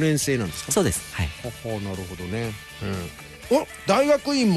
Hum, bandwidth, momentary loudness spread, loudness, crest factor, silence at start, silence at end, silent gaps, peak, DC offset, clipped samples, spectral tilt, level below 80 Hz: none; 13 kHz; 13 LU; -25 LUFS; 16 dB; 0 s; 0 s; none; -8 dBFS; under 0.1%; under 0.1%; -4.5 dB/octave; -44 dBFS